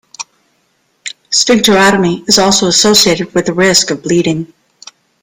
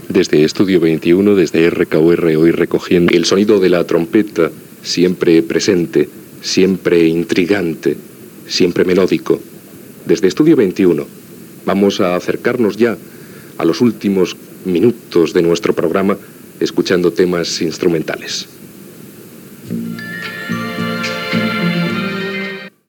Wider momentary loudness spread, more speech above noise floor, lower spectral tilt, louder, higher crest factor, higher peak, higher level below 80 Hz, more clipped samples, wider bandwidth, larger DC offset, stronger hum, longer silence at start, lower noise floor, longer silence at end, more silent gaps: first, 20 LU vs 12 LU; first, 49 dB vs 23 dB; second, -3 dB/octave vs -5.5 dB/octave; first, -9 LUFS vs -14 LUFS; about the same, 12 dB vs 14 dB; about the same, 0 dBFS vs 0 dBFS; first, -46 dBFS vs -52 dBFS; first, 0.1% vs under 0.1%; about the same, over 20 kHz vs 19 kHz; neither; neither; first, 0.2 s vs 0 s; first, -59 dBFS vs -36 dBFS; first, 0.75 s vs 0.2 s; neither